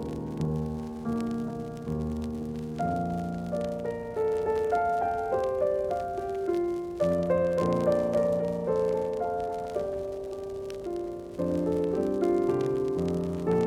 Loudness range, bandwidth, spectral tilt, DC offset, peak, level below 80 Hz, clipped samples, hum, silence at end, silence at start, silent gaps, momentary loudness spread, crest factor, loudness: 5 LU; 14.5 kHz; -8 dB/octave; under 0.1%; -14 dBFS; -50 dBFS; under 0.1%; none; 0 s; 0 s; none; 9 LU; 14 dB; -29 LUFS